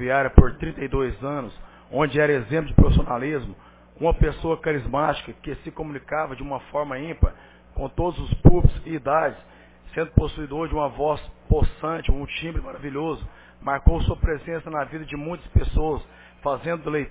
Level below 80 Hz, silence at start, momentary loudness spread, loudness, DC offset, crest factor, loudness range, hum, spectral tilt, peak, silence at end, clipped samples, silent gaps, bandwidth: -26 dBFS; 0 s; 14 LU; -24 LUFS; under 0.1%; 22 dB; 4 LU; none; -11.5 dB/octave; 0 dBFS; 0 s; under 0.1%; none; 4 kHz